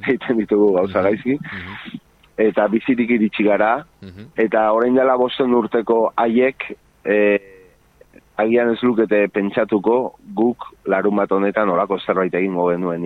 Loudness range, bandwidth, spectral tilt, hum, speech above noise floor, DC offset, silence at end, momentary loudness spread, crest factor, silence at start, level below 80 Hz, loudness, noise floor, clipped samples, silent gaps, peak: 2 LU; 4.9 kHz; -8.5 dB/octave; none; 34 dB; under 0.1%; 0 s; 13 LU; 14 dB; 0 s; -56 dBFS; -18 LUFS; -51 dBFS; under 0.1%; none; -4 dBFS